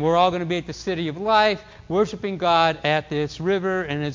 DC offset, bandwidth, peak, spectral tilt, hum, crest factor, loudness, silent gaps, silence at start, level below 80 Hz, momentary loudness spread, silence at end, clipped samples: under 0.1%; 7.6 kHz; -4 dBFS; -5.5 dB/octave; none; 18 dB; -22 LUFS; none; 0 s; -50 dBFS; 8 LU; 0 s; under 0.1%